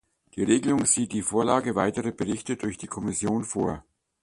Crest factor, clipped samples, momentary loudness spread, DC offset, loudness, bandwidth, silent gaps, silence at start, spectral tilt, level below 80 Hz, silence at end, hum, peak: 20 dB; under 0.1%; 10 LU; under 0.1%; -26 LUFS; 11.5 kHz; none; 0.35 s; -4.5 dB/octave; -54 dBFS; 0.45 s; none; -6 dBFS